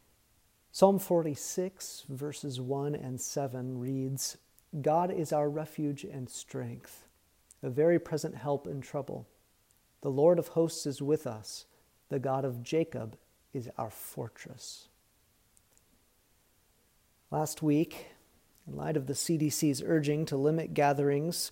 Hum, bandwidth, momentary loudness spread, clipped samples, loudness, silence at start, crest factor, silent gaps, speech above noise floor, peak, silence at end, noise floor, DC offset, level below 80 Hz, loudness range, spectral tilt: none; 16 kHz; 16 LU; under 0.1%; -32 LUFS; 0.75 s; 24 dB; none; 37 dB; -8 dBFS; 0 s; -69 dBFS; under 0.1%; -70 dBFS; 10 LU; -5.5 dB/octave